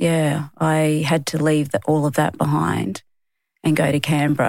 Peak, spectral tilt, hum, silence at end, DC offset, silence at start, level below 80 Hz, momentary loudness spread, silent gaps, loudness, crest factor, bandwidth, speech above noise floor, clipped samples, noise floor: -4 dBFS; -6 dB/octave; none; 0 s; under 0.1%; 0 s; -54 dBFS; 5 LU; none; -20 LUFS; 16 dB; 16.5 kHz; 54 dB; under 0.1%; -73 dBFS